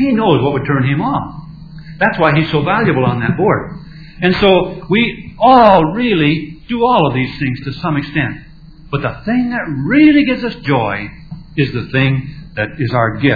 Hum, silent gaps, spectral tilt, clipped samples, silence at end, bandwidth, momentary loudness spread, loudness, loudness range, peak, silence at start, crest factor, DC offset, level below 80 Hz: none; none; -9 dB/octave; under 0.1%; 0 s; 5.4 kHz; 14 LU; -14 LUFS; 5 LU; 0 dBFS; 0 s; 14 dB; 0.2%; -38 dBFS